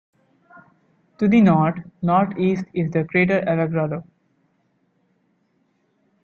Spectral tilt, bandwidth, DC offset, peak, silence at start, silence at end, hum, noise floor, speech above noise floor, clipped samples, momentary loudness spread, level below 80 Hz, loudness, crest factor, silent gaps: -9 dB/octave; 6.8 kHz; under 0.1%; -6 dBFS; 1.2 s; 2.2 s; none; -66 dBFS; 47 dB; under 0.1%; 9 LU; -60 dBFS; -20 LUFS; 16 dB; none